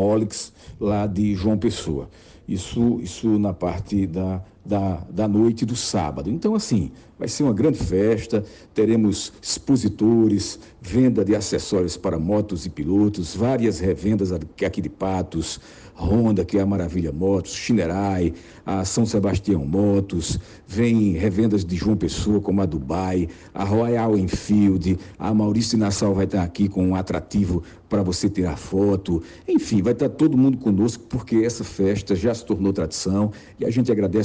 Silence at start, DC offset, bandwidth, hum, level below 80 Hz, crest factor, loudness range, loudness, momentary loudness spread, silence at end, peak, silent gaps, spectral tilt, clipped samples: 0 s; under 0.1%; 9.8 kHz; none; -42 dBFS; 14 dB; 3 LU; -22 LUFS; 9 LU; 0 s; -8 dBFS; none; -6.5 dB/octave; under 0.1%